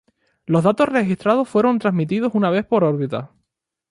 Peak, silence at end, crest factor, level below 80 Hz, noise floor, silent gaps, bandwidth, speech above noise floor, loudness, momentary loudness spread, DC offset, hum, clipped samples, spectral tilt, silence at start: -4 dBFS; 0.65 s; 16 dB; -60 dBFS; -76 dBFS; none; 11.5 kHz; 59 dB; -19 LUFS; 7 LU; under 0.1%; none; under 0.1%; -8 dB/octave; 0.5 s